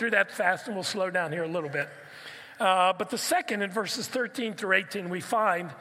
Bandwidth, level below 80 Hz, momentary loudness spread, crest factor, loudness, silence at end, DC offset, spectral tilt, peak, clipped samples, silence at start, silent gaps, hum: 16 kHz; -82 dBFS; 9 LU; 20 dB; -28 LUFS; 0 s; under 0.1%; -3 dB/octave; -8 dBFS; under 0.1%; 0 s; none; none